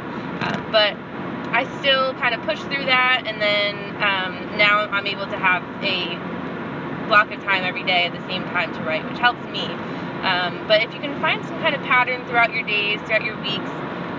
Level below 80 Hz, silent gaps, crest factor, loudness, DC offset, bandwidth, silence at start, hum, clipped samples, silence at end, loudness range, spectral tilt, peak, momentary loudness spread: -56 dBFS; none; 20 dB; -20 LUFS; under 0.1%; 7.6 kHz; 0 s; none; under 0.1%; 0 s; 3 LU; -5.5 dB/octave; -2 dBFS; 11 LU